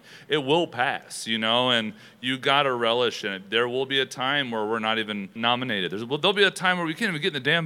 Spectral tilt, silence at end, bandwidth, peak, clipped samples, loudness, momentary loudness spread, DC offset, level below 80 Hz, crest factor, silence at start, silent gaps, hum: -4 dB/octave; 0 s; 16 kHz; -4 dBFS; under 0.1%; -24 LUFS; 8 LU; under 0.1%; -78 dBFS; 20 dB; 0.05 s; none; none